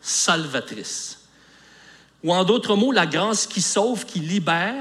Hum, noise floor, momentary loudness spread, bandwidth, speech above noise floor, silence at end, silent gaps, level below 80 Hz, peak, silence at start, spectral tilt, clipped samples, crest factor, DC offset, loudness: none; -52 dBFS; 11 LU; 14 kHz; 30 dB; 0 s; none; -70 dBFS; -4 dBFS; 0.05 s; -3 dB/octave; under 0.1%; 18 dB; under 0.1%; -21 LUFS